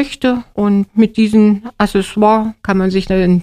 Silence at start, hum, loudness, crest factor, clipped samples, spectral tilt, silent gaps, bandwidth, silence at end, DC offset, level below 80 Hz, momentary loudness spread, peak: 0 s; none; -14 LUFS; 12 dB; under 0.1%; -7 dB/octave; none; 13 kHz; 0 s; under 0.1%; -36 dBFS; 6 LU; 0 dBFS